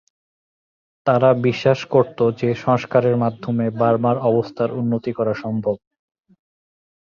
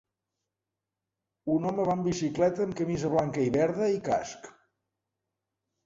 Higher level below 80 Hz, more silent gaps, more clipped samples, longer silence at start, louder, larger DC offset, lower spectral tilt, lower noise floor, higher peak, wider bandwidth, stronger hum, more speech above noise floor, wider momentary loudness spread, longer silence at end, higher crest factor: about the same, -58 dBFS vs -62 dBFS; neither; neither; second, 1.05 s vs 1.45 s; first, -19 LUFS vs -28 LUFS; neither; first, -8 dB/octave vs -6.5 dB/octave; about the same, under -90 dBFS vs -88 dBFS; first, -2 dBFS vs -14 dBFS; second, 7 kHz vs 7.8 kHz; neither; first, over 72 dB vs 60 dB; about the same, 7 LU vs 5 LU; about the same, 1.3 s vs 1.35 s; about the same, 18 dB vs 16 dB